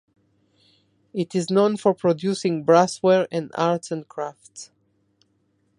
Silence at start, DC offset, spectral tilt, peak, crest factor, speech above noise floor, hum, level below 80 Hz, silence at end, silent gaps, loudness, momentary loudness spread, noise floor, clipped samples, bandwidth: 1.15 s; under 0.1%; -6 dB/octave; -4 dBFS; 20 dB; 46 dB; none; -70 dBFS; 1.15 s; none; -22 LUFS; 16 LU; -67 dBFS; under 0.1%; 11.5 kHz